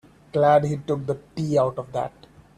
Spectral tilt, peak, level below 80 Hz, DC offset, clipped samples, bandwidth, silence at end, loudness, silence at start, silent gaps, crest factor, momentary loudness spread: -7.5 dB/octave; -6 dBFS; -56 dBFS; under 0.1%; under 0.1%; 11 kHz; 0.5 s; -23 LUFS; 0.35 s; none; 18 dB; 12 LU